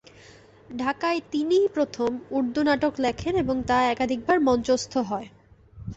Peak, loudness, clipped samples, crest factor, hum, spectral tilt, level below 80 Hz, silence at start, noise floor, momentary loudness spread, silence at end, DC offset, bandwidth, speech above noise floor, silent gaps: -10 dBFS; -24 LUFS; under 0.1%; 16 dB; none; -5 dB/octave; -50 dBFS; 0.7 s; -51 dBFS; 7 LU; 0 s; under 0.1%; 8.2 kHz; 27 dB; none